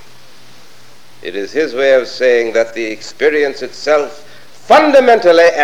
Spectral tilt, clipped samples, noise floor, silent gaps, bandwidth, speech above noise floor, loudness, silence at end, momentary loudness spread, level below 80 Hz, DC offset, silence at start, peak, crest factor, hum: -3.5 dB/octave; 0.4%; -44 dBFS; none; 12.5 kHz; 32 dB; -12 LUFS; 0 s; 15 LU; -58 dBFS; 2%; 1.25 s; 0 dBFS; 14 dB; none